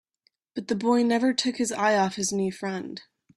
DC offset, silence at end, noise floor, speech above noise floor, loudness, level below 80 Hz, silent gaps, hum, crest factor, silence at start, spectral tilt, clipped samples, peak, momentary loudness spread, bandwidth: under 0.1%; 0.35 s; -71 dBFS; 46 dB; -25 LUFS; -68 dBFS; none; none; 16 dB; 0.55 s; -4 dB/octave; under 0.1%; -10 dBFS; 15 LU; 12.5 kHz